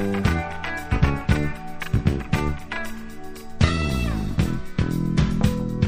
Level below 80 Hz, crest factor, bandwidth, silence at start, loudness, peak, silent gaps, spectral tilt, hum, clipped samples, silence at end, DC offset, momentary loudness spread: -30 dBFS; 22 dB; 15.5 kHz; 0 s; -24 LUFS; -2 dBFS; none; -6.5 dB/octave; none; under 0.1%; 0 s; under 0.1%; 11 LU